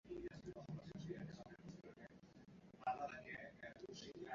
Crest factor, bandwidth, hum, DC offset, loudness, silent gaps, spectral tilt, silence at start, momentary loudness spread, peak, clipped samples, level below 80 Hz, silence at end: 22 dB; 7.4 kHz; none; under 0.1%; -53 LUFS; none; -5 dB/octave; 0.05 s; 15 LU; -32 dBFS; under 0.1%; -74 dBFS; 0 s